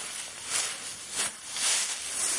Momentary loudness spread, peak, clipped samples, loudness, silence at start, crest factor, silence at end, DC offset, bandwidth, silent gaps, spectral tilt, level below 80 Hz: 10 LU; -14 dBFS; under 0.1%; -29 LUFS; 0 s; 18 dB; 0 s; under 0.1%; 11.5 kHz; none; 2 dB/octave; -70 dBFS